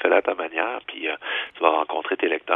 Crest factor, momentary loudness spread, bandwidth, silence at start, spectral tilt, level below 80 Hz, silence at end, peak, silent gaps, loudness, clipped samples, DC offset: 22 dB; 7 LU; 3.9 kHz; 0 s; -5.5 dB/octave; -72 dBFS; 0 s; 0 dBFS; none; -24 LUFS; under 0.1%; under 0.1%